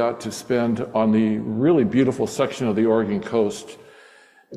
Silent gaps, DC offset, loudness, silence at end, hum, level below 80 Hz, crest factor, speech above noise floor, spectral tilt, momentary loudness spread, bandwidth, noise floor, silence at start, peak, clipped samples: none; under 0.1%; -21 LUFS; 0 s; none; -58 dBFS; 16 dB; 31 dB; -6.5 dB/octave; 7 LU; 13 kHz; -51 dBFS; 0 s; -6 dBFS; under 0.1%